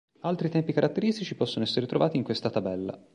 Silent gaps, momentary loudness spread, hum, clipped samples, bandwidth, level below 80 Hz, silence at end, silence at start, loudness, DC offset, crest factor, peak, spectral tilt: none; 5 LU; none; under 0.1%; 11 kHz; -64 dBFS; 0.15 s; 0.25 s; -28 LUFS; under 0.1%; 18 dB; -10 dBFS; -7 dB/octave